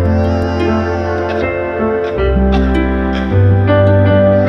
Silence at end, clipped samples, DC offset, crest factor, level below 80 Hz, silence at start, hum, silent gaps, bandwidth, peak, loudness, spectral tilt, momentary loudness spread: 0 s; under 0.1%; under 0.1%; 10 dB; -22 dBFS; 0 s; none; none; 6.2 kHz; 0 dBFS; -13 LUFS; -9 dB/octave; 7 LU